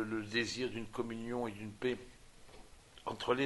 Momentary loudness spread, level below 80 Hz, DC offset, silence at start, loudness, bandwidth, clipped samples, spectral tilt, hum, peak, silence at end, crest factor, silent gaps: 23 LU; -62 dBFS; under 0.1%; 0 s; -39 LUFS; 11.5 kHz; under 0.1%; -4.5 dB/octave; none; -16 dBFS; 0 s; 22 dB; none